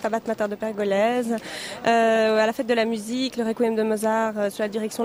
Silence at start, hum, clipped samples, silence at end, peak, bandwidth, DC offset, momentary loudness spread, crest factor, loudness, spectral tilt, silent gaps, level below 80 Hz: 0 s; none; under 0.1%; 0 s; -8 dBFS; 16 kHz; under 0.1%; 8 LU; 16 dB; -23 LUFS; -4.5 dB/octave; none; -64 dBFS